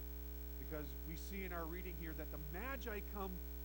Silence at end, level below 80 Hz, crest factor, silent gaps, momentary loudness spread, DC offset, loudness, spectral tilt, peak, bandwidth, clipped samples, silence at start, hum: 0 s; -50 dBFS; 16 dB; none; 3 LU; under 0.1%; -47 LUFS; -6 dB/octave; -30 dBFS; 19 kHz; under 0.1%; 0 s; 60 Hz at -50 dBFS